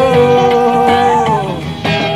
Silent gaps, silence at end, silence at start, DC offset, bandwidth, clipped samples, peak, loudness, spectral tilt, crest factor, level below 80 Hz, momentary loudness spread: none; 0 s; 0 s; 0.5%; 13 kHz; under 0.1%; 0 dBFS; -11 LUFS; -6 dB/octave; 10 dB; -40 dBFS; 8 LU